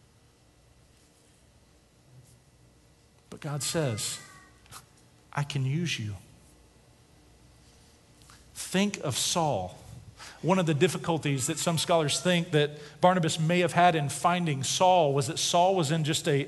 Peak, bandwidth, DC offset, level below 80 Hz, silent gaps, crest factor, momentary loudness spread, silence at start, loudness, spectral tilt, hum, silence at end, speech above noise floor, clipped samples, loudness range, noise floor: -6 dBFS; 12.5 kHz; under 0.1%; -62 dBFS; none; 22 dB; 17 LU; 3.3 s; -27 LUFS; -4.5 dB/octave; none; 0 s; 34 dB; under 0.1%; 11 LU; -61 dBFS